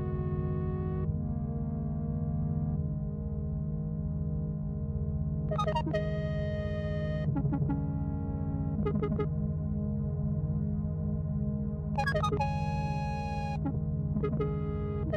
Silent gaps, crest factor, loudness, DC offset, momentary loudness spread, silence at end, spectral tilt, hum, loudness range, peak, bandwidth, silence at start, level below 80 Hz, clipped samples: none; 14 dB; -33 LUFS; under 0.1%; 4 LU; 0 s; -9 dB/octave; none; 2 LU; -18 dBFS; 7.8 kHz; 0 s; -42 dBFS; under 0.1%